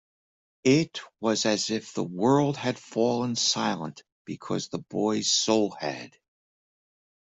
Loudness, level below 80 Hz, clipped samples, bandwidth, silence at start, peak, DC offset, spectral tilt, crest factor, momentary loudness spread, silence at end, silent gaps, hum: -26 LUFS; -70 dBFS; under 0.1%; 8.2 kHz; 0.65 s; -8 dBFS; under 0.1%; -4 dB/octave; 18 dB; 13 LU; 1.15 s; 4.12-4.25 s; none